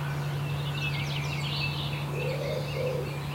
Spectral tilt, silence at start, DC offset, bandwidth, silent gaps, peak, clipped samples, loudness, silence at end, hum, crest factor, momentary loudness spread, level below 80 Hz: -5.5 dB/octave; 0 s; under 0.1%; 16 kHz; none; -18 dBFS; under 0.1%; -31 LUFS; 0 s; none; 14 dB; 2 LU; -50 dBFS